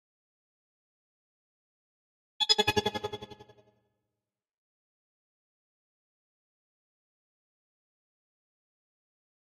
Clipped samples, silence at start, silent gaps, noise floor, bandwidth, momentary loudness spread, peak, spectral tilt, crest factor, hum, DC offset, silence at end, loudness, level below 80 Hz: under 0.1%; 2.4 s; none; -90 dBFS; 15.5 kHz; 20 LU; -10 dBFS; -2.5 dB/octave; 30 dB; none; under 0.1%; 6.15 s; -27 LUFS; -68 dBFS